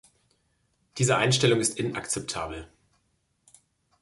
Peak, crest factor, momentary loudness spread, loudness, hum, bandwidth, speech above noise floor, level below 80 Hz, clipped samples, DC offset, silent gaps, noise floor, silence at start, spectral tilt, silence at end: -8 dBFS; 20 dB; 16 LU; -25 LUFS; none; 12 kHz; 47 dB; -56 dBFS; under 0.1%; under 0.1%; none; -73 dBFS; 0.95 s; -4 dB/octave; 1.35 s